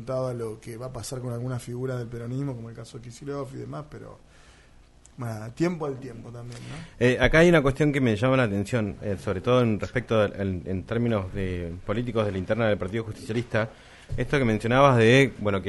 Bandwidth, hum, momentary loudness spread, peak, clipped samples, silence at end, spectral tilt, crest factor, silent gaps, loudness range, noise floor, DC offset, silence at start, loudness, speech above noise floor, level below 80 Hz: 11.5 kHz; none; 19 LU; -6 dBFS; under 0.1%; 0 s; -6.5 dB/octave; 20 dB; none; 12 LU; -53 dBFS; under 0.1%; 0 s; -25 LUFS; 28 dB; -44 dBFS